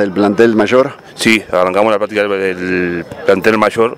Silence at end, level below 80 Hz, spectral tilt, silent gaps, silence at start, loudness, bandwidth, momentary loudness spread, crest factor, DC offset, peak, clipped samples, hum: 0 s; -50 dBFS; -5 dB/octave; none; 0 s; -13 LUFS; 16 kHz; 6 LU; 12 dB; under 0.1%; 0 dBFS; 0.2%; none